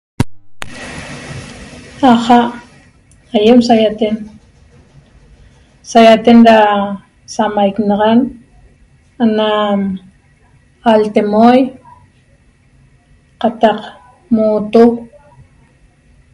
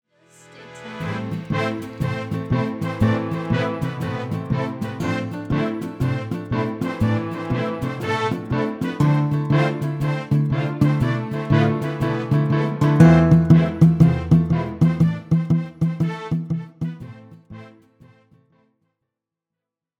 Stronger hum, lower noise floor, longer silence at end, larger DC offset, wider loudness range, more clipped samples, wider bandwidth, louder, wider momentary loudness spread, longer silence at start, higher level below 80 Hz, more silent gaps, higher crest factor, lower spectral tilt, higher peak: neither; second, -49 dBFS vs -85 dBFS; second, 1.3 s vs 2.3 s; neither; second, 5 LU vs 9 LU; first, 0.9% vs under 0.1%; first, 11 kHz vs 9.2 kHz; first, -11 LUFS vs -21 LUFS; first, 21 LU vs 12 LU; second, 0.2 s vs 0.55 s; about the same, -44 dBFS vs -42 dBFS; neither; second, 14 dB vs 20 dB; second, -6 dB/octave vs -8.5 dB/octave; about the same, 0 dBFS vs 0 dBFS